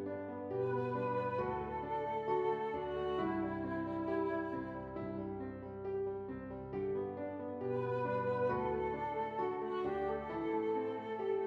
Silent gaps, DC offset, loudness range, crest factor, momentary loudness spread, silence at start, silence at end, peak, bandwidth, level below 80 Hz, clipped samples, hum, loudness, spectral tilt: none; under 0.1%; 4 LU; 14 dB; 7 LU; 0 s; 0 s; -24 dBFS; 5.8 kHz; -64 dBFS; under 0.1%; none; -39 LUFS; -9 dB/octave